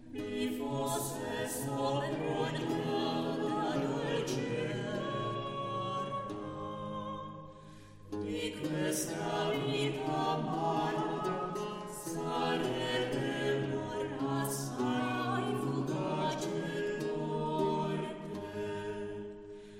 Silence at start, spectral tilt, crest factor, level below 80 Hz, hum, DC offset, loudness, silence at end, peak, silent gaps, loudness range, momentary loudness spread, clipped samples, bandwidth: 0 s; -5 dB/octave; 16 dB; -64 dBFS; none; under 0.1%; -35 LUFS; 0 s; -20 dBFS; none; 4 LU; 8 LU; under 0.1%; 16 kHz